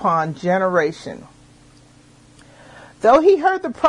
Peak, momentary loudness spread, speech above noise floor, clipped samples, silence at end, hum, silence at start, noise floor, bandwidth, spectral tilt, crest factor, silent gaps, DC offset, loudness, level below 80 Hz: -2 dBFS; 21 LU; 32 dB; under 0.1%; 0 s; none; 0 s; -49 dBFS; 10.5 kHz; -6.5 dB/octave; 16 dB; none; under 0.1%; -17 LUFS; -54 dBFS